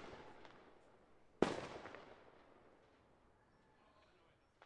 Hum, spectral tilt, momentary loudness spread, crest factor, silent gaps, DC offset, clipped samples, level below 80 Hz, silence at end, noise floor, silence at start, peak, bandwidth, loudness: none; -5.5 dB/octave; 26 LU; 34 dB; none; under 0.1%; under 0.1%; -74 dBFS; 0 s; -73 dBFS; 0 s; -16 dBFS; 10.5 kHz; -45 LUFS